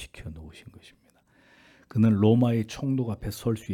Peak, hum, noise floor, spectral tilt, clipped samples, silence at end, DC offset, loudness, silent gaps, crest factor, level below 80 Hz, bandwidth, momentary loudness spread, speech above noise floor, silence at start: -8 dBFS; none; -62 dBFS; -8 dB/octave; under 0.1%; 0 s; under 0.1%; -25 LUFS; none; 20 dB; -52 dBFS; 15 kHz; 21 LU; 39 dB; 0 s